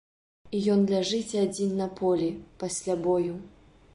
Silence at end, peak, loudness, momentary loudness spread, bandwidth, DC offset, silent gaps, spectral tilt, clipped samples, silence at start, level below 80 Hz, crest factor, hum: 0.45 s; -14 dBFS; -28 LUFS; 10 LU; 11.5 kHz; under 0.1%; none; -5.5 dB/octave; under 0.1%; 0.45 s; -60 dBFS; 14 dB; none